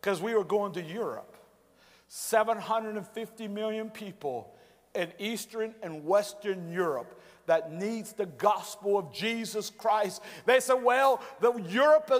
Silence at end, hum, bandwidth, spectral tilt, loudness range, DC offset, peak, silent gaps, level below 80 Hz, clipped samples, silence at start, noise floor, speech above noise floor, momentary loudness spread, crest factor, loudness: 0 s; none; 16 kHz; -4 dB/octave; 6 LU; under 0.1%; -10 dBFS; none; -78 dBFS; under 0.1%; 0.05 s; -61 dBFS; 32 dB; 14 LU; 20 dB; -30 LUFS